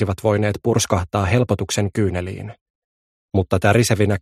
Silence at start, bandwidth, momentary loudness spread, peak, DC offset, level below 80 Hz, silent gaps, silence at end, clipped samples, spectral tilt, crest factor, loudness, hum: 0 s; 15 kHz; 10 LU; -2 dBFS; under 0.1%; -42 dBFS; 2.61-3.29 s; 0 s; under 0.1%; -5.5 dB/octave; 18 dB; -19 LUFS; none